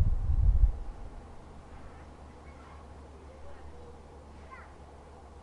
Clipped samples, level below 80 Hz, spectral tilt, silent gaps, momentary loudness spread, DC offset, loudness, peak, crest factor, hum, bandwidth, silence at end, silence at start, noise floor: under 0.1%; -34 dBFS; -8 dB/octave; none; 22 LU; under 0.1%; -31 LUFS; -10 dBFS; 22 dB; none; 5.6 kHz; 0 s; 0 s; -50 dBFS